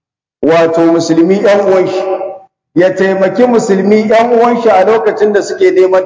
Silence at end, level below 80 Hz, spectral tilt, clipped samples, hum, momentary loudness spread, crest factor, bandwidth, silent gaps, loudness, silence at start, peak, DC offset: 0 s; -56 dBFS; -6 dB/octave; 1%; none; 7 LU; 8 dB; 8 kHz; none; -9 LUFS; 0.4 s; 0 dBFS; under 0.1%